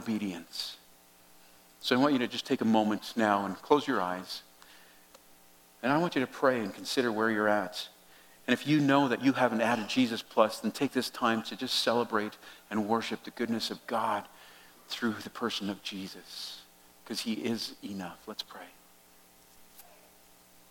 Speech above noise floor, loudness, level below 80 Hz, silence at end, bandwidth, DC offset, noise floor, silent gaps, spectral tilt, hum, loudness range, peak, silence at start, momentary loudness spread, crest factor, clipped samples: 29 dB; -31 LUFS; -76 dBFS; 0.9 s; 17.5 kHz; under 0.1%; -59 dBFS; none; -4.5 dB/octave; none; 10 LU; -10 dBFS; 0 s; 14 LU; 22 dB; under 0.1%